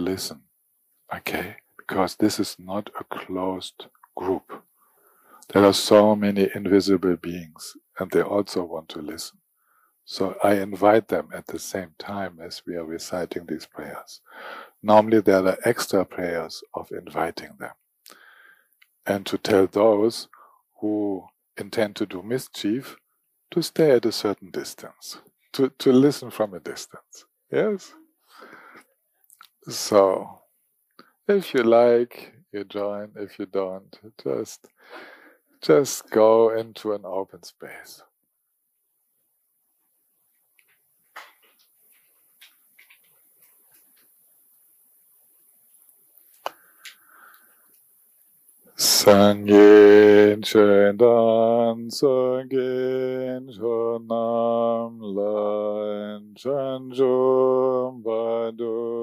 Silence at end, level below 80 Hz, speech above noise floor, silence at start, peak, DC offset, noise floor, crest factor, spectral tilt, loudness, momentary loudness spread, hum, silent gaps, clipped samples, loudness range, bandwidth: 0 s; -68 dBFS; 52 dB; 0 s; -4 dBFS; under 0.1%; -74 dBFS; 20 dB; -4.5 dB/octave; -21 LUFS; 21 LU; none; none; under 0.1%; 14 LU; 15.5 kHz